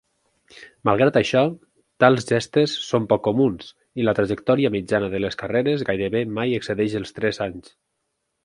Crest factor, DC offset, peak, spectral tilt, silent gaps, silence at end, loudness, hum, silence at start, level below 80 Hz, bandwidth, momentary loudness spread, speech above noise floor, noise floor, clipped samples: 22 dB; under 0.1%; 0 dBFS; -6 dB/octave; none; 0.85 s; -21 LUFS; none; 0.55 s; -54 dBFS; 11 kHz; 8 LU; 55 dB; -76 dBFS; under 0.1%